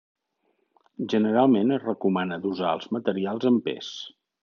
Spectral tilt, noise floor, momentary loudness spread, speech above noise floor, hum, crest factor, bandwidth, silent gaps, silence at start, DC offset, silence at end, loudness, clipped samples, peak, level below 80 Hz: -5 dB/octave; -73 dBFS; 15 LU; 48 dB; none; 20 dB; 6.8 kHz; none; 1 s; under 0.1%; 0.35 s; -25 LUFS; under 0.1%; -6 dBFS; -80 dBFS